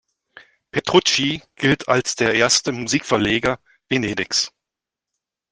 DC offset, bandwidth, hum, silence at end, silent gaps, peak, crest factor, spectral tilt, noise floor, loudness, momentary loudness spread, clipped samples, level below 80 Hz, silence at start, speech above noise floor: under 0.1%; 10 kHz; none; 1.05 s; none; 0 dBFS; 20 dB; -3 dB/octave; -86 dBFS; -19 LUFS; 8 LU; under 0.1%; -52 dBFS; 0.75 s; 67 dB